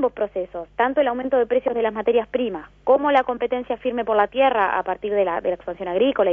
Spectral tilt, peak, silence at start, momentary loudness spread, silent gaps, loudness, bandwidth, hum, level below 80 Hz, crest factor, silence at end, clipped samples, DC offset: -7 dB/octave; -4 dBFS; 0 s; 8 LU; none; -21 LUFS; 3.7 kHz; 50 Hz at -55 dBFS; -54 dBFS; 18 dB; 0 s; under 0.1%; under 0.1%